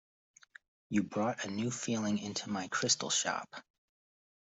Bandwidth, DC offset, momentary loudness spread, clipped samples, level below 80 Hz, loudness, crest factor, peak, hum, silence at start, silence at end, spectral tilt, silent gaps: 8.2 kHz; under 0.1%; 8 LU; under 0.1%; -74 dBFS; -34 LUFS; 20 dB; -16 dBFS; none; 0.9 s; 0.85 s; -3 dB/octave; none